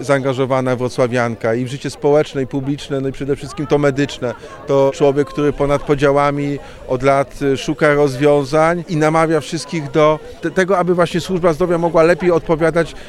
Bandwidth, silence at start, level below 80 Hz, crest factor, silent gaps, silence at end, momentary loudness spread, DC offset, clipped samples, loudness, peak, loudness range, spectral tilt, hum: 13 kHz; 0 s; -38 dBFS; 16 dB; none; 0 s; 8 LU; under 0.1%; under 0.1%; -16 LUFS; 0 dBFS; 3 LU; -6.5 dB/octave; none